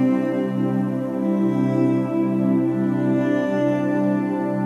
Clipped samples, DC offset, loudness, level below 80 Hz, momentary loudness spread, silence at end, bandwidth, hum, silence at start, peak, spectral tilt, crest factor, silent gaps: under 0.1%; under 0.1%; -21 LUFS; -64 dBFS; 3 LU; 0 s; 10.5 kHz; none; 0 s; -10 dBFS; -9 dB/octave; 10 dB; none